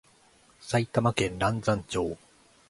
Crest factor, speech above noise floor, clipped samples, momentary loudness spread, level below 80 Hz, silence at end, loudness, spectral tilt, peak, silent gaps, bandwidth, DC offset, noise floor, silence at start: 22 dB; 33 dB; under 0.1%; 11 LU; -52 dBFS; 0.55 s; -28 LUFS; -5.5 dB/octave; -8 dBFS; none; 11.5 kHz; under 0.1%; -60 dBFS; 0.6 s